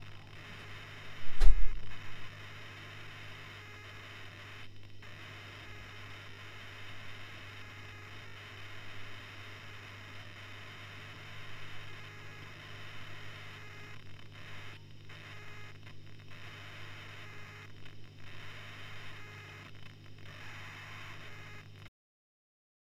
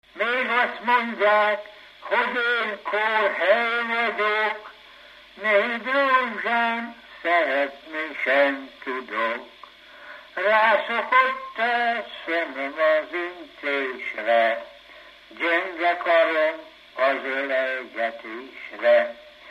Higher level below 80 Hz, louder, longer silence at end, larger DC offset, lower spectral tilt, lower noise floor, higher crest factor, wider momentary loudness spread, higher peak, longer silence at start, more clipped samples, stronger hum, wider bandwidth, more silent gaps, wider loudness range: first, -42 dBFS vs -70 dBFS; second, -47 LUFS vs -23 LUFS; first, 1.3 s vs 0 s; neither; about the same, -4.5 dB/octave vs -3.5 dB/octave; about the same, -49 dBFS vs -48 dBFS; first, 26 dB vs 18 dB; second, 5 LU vs 12 LU; about the same, -6 dBFS vs -6 dBFS; second, 0 s vs 0.15 s; neither; first, 50 Hz at -55 dBFS vs none; second, 7.2 kHz vs 13 kHz; neither; first, 8 LU vs 3 LU